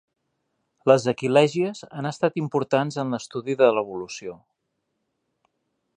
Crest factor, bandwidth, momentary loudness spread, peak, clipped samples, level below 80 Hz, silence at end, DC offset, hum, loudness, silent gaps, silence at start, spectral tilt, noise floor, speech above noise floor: 22 dB; 10 kHz; 13 LU; -4 dBFS; under 0.1%; -70 dBFS; 1.6 s; under 0.1%; none; -23 LUFS; none; 0.85 s; -6 dB/octave; -77 dBFS; 55 dB